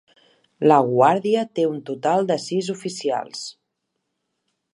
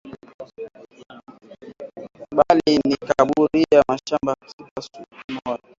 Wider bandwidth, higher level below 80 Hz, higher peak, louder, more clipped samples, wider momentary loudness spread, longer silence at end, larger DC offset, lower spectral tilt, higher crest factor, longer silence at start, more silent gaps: first, 11.5 kHz vs 7.6 kHz; second, -72 dBFS vs -54 dBFS; about the same, -2 dBFS vs -2 dBFS; about the same, -20 LUFS vs -19 LUFS; neither; second, 12 LU vs 23 LU; first, 1.2 s vs 0.25 s; neither; about the same, -5.5 dB/octave vs -5.5 dB/octave; about the same, 20 dB vs 20 dB; first, 0.6 s vs 0.05 s; second, none vs 0.34-0.39 s, 4.53-4.59 s, 4.71-4.76 s, 5.24-5.28 s